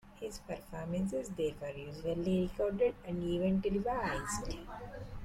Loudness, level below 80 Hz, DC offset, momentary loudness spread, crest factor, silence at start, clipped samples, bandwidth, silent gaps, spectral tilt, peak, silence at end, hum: -36 LUFS; -50 dBFS; under 0.1%; 13 LU; 14 dB; 0.05 s; under 0.1%; 14.5 kHz; none; -6 dB/octave; -22 dBFS; 0 s; none